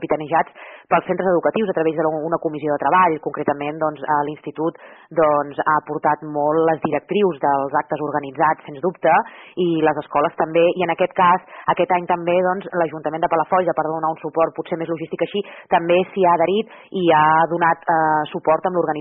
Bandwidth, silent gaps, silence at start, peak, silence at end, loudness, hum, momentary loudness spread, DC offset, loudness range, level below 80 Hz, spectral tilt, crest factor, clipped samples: 3.9 kHz; none; 0 s; -4 dBFS; 0 s; -19 LUFS; none; 8 LU; under 0.1%; 3 LU; -62 dBFS; -4.5 dB/octave; 14 dB; under 0.1%